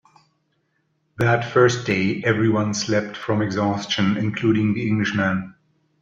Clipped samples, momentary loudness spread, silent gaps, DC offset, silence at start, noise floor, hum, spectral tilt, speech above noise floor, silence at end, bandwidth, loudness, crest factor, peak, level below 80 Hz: under 0.1%; 6 LU; none; under 0.1%; 1.2 s; -69 dBFS; none; -5.5 dB/octave; 49 dB; 0.5 s; 7.8 kHz; -21 LUFS; 18 dB; -4 dBFS; -58 dBFS